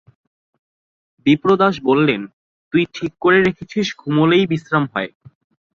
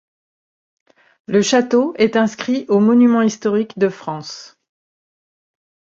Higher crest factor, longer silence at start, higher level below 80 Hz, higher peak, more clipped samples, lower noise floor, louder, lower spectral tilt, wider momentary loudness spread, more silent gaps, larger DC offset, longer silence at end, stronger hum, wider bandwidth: about the same, 18 dB vs 16 dB; about the same, 1.25 s vs 1.3 s; first, -54 dBFS vs -64 dBFS; about the same, -2 dBFS vs -2 dBFS; neither; about the same, under -90 dBFS vs under -90 dBFS; about the same, -17 LUFS vs -16 LUFS; first, -6.5 dB/octave vs -5 dB/octave; second, 9 LU vs 15 LU; first, 2.33-2.71 s vs none; neither; second, 0.7 s vs 1.5 s; neither; about the same, 7.2 kHz vs 7.8 kHz